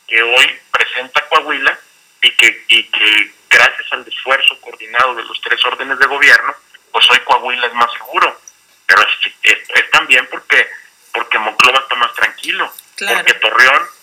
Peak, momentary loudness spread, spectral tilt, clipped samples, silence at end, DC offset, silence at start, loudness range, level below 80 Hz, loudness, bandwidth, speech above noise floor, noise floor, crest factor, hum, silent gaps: 0 dBFS; 11 LU; 0.5 dB/octave; 1%; 0.1 s; under 0.1%; 0.1 s; 2 LU; -58 dBFS; -11 LUFS; over 20 kHz; 30 dB; -43 dBFS; 14 dB; none; none